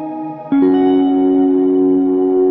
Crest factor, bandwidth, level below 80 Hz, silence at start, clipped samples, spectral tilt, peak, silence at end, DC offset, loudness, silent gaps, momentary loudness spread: 8 dB; 3.9 kHz; -60 dBFS; 0 s; under 0.1%; -11 dB/octave; -4 dBFS; 0 s; under 0.1%; -13 LUFS; none; 6 LU